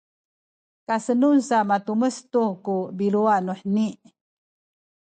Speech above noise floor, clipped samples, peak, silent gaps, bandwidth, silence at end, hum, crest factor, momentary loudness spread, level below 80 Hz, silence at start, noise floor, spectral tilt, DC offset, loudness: over 68 dB; under 0.1%; -8 dBFS; none; 9.2 kHz; 1.1 s; none; 16 dB; 8 LU; -74 dBFS; 0.9 s; under -90 dBFS; -6.5 dB/octave; under 0.1%; -23 LUFS